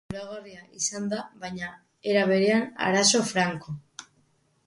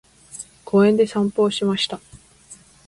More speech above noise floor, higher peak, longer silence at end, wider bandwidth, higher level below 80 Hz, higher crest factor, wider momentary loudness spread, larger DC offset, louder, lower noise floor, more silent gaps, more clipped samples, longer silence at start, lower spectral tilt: first, 41 dB vs 29 dB; about the same, -8 dBFS vs -6 dBFS; first, 0.65 s vs 0.35 s; about the same, 11.5 kHz vs 11.5 kHz; second, -64 dBFS vs -58 dBFS; about the same, 20 dB vs 16 dB; about the same, 19 LU vs 20 LU; neither; second, -25 LUFS vs -19 LUFS; first, -67 dBFS vs -47 dBFS; neither; neither; second, 0.1 s vs 0.35 s; second, -3 dB/octave vs -5.5 dB/octave